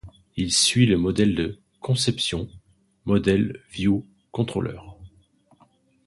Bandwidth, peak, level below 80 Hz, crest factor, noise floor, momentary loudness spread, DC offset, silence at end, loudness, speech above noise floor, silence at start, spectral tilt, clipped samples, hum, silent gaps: 11.5 kHz; -6 dBFS; -46 dBFS; 20 dB; -60 dBFS; 17 LU; under 0.1%; 1 s; -23 LUFS; 38 dB; 0.05 s; -4.5 dB/octave; under 0.1%; none; none